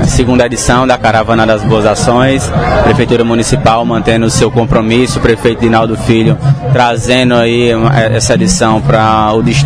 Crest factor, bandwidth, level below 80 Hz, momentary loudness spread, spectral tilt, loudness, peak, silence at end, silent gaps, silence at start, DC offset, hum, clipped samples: 8 dB; 11 kHz; -24 dBFS; 2 LU; -5.5 dB/octave; -9 LUFS; 0 dBFS; 0 s; none; 0 s; 0.4%; none; 1%